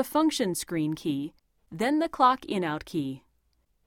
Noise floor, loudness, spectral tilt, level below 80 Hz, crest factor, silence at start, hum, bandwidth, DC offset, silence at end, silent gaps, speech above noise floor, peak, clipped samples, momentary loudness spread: -71 dBFS; -28 LUFS; -4.5 dB/octave; -62 dBFS; 20 dB; 0 s; none; 18 kHz; under 0.1%; 0.7 s; none; 43 dB; -8 dBFS; under 0.1%; 14 LU